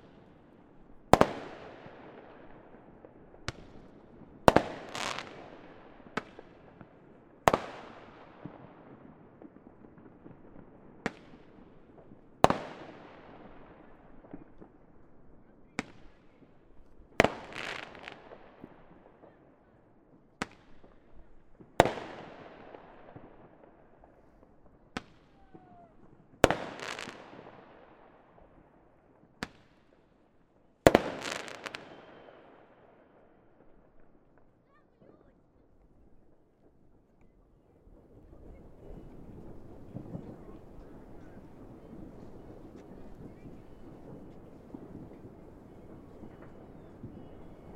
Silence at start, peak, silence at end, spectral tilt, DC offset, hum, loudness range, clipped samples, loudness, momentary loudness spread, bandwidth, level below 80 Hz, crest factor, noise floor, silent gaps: 0.05 s; 0 dBFS; 0 s; -5 dB/octave; under 0.1%; none; 18 LU; under 0.1%; -32 LUFS; 28 LU; 16 kHz; -56 dBFS; 38 dB; -65 dBFS; none